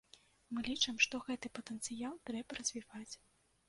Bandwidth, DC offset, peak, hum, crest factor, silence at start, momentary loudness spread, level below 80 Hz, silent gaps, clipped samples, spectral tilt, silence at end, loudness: 11.5 kHz; under 0.1%; -18 dBFS; none; 24 dB; 0.5 s; 17 LU; -70 dBFS; none; under 0.1%; -1 dB/octave; 0.5 s; -39 LUFS